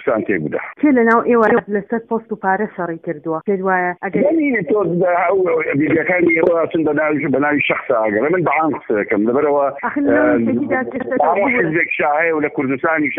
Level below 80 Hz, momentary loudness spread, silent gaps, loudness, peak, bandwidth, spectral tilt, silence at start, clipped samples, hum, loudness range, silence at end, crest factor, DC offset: -56 dBFS; 7 LU; none; -16 LUFS; 0 dBFS; 3.8 kHz; -9.5 dB/octave; 0 s; under 0.1%; none; 2 LU; 0 s; 16 dB; under 0.1%